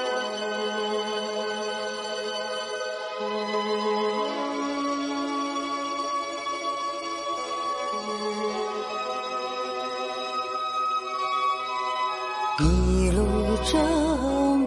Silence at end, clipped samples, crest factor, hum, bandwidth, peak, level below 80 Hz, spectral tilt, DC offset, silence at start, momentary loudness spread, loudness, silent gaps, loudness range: 0 s; under 0.1%; 18 dB; none; 11.5 kHz; -10 dBFS; -36 dBFS; -5 dB/octave; under 0.1%; 0 s; 7 LU; -27 LUFS; none; 5 LU